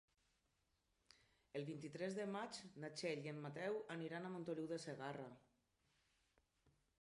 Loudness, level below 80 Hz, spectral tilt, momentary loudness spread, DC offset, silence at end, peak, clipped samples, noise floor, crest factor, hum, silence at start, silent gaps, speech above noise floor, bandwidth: -49 LUFS; -86 dBFS; -5.5 dB/octave; 6 LU; under 0.1%; 1.65 s; -32 dBFS; under 0.1%; -85 dBFS; 18 dB; none; 1.55 s; none; 37 dB; 11 kHz